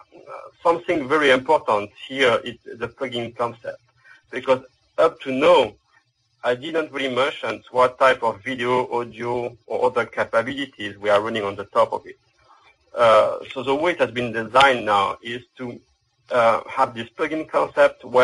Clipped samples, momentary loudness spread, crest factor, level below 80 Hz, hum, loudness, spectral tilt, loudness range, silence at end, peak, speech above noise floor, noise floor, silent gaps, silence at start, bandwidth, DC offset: under 0.1%; 15 LU; 22 dB; -60 dBFS; none; -21 LUFS; -4.5 dB/octave; 4 LU; 0 s; 0 dBFS; 42 dB; -62 dBFS; none; 0.15 s; 11.5 kHz; under 0.1%